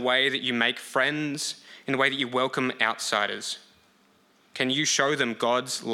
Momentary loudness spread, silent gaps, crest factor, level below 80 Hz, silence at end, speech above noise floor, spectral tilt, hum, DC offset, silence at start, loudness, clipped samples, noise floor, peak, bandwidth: 10 LU; none; 20 dB; -80 dBFS; 0 s; 36 dB; -2.5 dB/octave; none; under 0.1%; 0 s; -25 LUFS; under 0.1%; -62 dBFS; -6 dBFS; 16.5 kHz